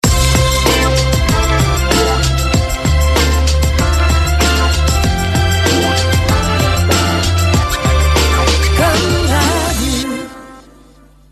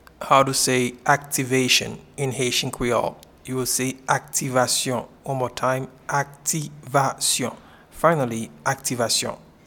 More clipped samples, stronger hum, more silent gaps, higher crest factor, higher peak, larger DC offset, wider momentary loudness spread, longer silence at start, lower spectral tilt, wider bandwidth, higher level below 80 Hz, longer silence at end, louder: neither; neither; neither; second, 12 dB vs 22 dB; about the same, 0 dBFS vs -2 dBFS; neither; second, 3 LU vs 10 LU; second, 0.05 s vs 0.2 s; first, -4.5 dB/octave vs -3 dB/octave; second, 13.5 kHz vs 19 kHz; first, -16 dBFS vs -54 dBFS; first, 0.7 s vs 0.3 s; first, -13 LUFS vs -22 LUFS